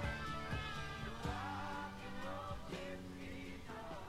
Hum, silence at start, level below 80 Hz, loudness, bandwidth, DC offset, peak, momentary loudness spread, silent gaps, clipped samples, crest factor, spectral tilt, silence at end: none; 0 s; -54 dBFS; -46 LUFS; 16 kHz; under 0.1%; -28 dBFS; 6 LU; none; under 0.1%; 16 dB; -5.5 dB/octave; 0 s